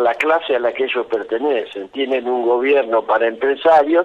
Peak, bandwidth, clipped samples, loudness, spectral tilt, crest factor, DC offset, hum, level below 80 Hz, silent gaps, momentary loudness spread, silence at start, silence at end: -4 dBFS; 8.2 kHz; under 0.1%; -17 LUFS; -4.5 dB/octave; 12 dB; under 0.1%; none; -62 dBFS; none; 8 LU; 0 s; 0 s